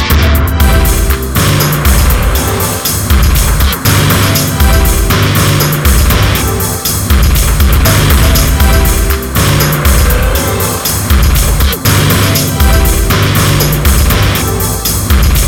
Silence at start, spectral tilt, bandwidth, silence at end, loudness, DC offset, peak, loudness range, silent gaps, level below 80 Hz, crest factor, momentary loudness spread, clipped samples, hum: 0 s; -4 dB/octave; 20 kHz; 0 s; -9 LUFS; under 0.1%; 0 dBFS; 1 LU; none; -12 dBFS; 8 dB; 4 LU; 0.1%; none